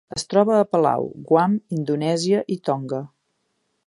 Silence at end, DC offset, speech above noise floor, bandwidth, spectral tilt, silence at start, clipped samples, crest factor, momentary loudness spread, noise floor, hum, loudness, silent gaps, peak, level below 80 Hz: 0.8 s; under 0.1%; 51 dB; 11.5 kHz; -6 dB/octave; 0.1 s; under 0.1%; 18 dB; 8 LU; -72 dBFS; none; -21 LUFS; none; -2 dBFS; -64 dBFS